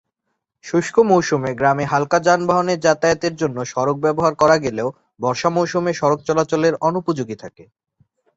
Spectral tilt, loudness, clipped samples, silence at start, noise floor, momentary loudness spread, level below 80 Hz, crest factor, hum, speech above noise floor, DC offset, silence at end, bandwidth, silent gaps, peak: -5.5 dB/octave; -18 LUFS; under 0.1%; 0.65 s; -76 dBFS; 8 LU; -54 dBFS; 18 dB; none; 58 dB; under 0.1%; 0.75 s; 8 kHz; none; 0 dBFS